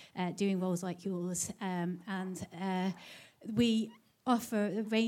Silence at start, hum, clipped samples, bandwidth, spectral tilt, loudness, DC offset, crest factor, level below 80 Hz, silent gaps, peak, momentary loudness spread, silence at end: 0 s; none; under 0.1%; 17.5 kHz; -5 dB/octave; -35 LUFS; under 0.1%; 20 dB; -72 dBFS; none; -16 dBFS; 11 LU; 0 s